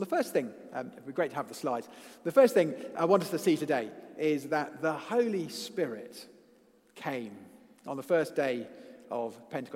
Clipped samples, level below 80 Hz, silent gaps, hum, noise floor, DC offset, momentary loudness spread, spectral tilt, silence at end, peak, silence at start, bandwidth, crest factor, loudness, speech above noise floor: under 0.1%; -84 dBFS; none; none; -63 dBFS; under 0.1%; 16 LU; -5.5 dB/octave; 0 s; -10 dBFS; 0 s; 16 kHz; 22 dB; -31 LUFS; 32 dB